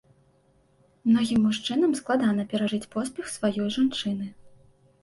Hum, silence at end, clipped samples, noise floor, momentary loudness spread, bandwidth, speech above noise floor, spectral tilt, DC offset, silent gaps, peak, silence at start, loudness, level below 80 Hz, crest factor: none; 0.55 s; under 0.1%; -63 dBFS; 9 LU; 11.5 kHz; 38 dB; -5 dB/octave; under 0.1%; none; -12 dBFS; 1.05 s; -26 LUFS; -62 dBFS; 14 dB